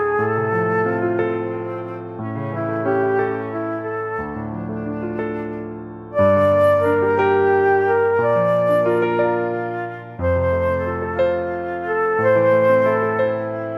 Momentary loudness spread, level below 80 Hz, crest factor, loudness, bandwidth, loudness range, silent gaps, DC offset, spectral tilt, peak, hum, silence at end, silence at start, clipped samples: 12 LU; -46 dBFS; 14 dB; -19 LUFS; 12.5 kHz; 7 LU; none; under 0.1%; -8.5 dB/octave; -6 dBFS; none; 0 s; 0 s; under 0.1%